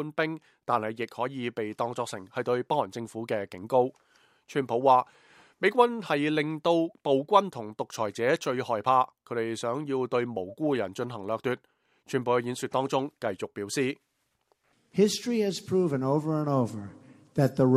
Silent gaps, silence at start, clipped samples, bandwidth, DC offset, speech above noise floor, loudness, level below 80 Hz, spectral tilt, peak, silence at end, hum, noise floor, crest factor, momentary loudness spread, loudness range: none; 0 s; under 0.1%; 15 kHz; under 0.1%; 45 dB; -28 LUFS; -72 dBFS; -5.5 dB/octave; -6 dBFS; 0 s; none; -73 dBFS; 22 dB; 10 LU; 5 LU